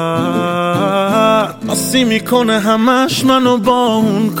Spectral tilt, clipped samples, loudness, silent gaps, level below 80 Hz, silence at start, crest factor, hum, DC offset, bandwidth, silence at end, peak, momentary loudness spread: -4.5 dB/octave; under 0.1%; -13 LUFS; none; -50 dBFS; 0 s; 12 dB; none; under 0.1%; 17 kHz; 0 s; -2 dBFS; 4 LU